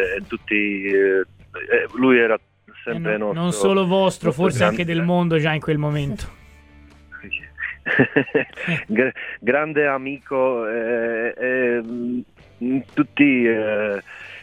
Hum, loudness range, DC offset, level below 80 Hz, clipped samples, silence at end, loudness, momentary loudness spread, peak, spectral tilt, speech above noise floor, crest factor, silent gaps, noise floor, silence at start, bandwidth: none; 3 LU; under 0.1%; -50 dBFS; under 0.1%; 0 s; -20 LUFS; 13 LU; -2 dBFS; -6 dB/octave; 27 dB; 20 dB; none; -47 dBFS; 0 s; 15 kHz